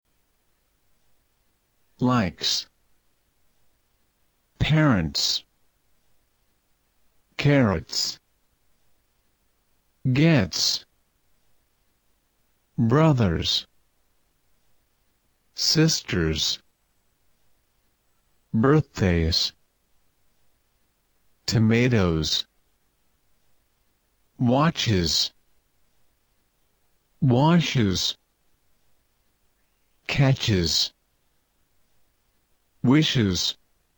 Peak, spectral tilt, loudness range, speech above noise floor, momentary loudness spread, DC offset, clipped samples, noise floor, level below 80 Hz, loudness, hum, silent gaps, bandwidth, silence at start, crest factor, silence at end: -8 dBFS; -5 dB/octave; 3 LU; 47 dB; 9 LU; under 0.1%; under 0.1%; -68 dBFS; -46 dBFS; -22 LUFS; none; none; 19.5 kHz; 2 s; 18 dB; 0.45 s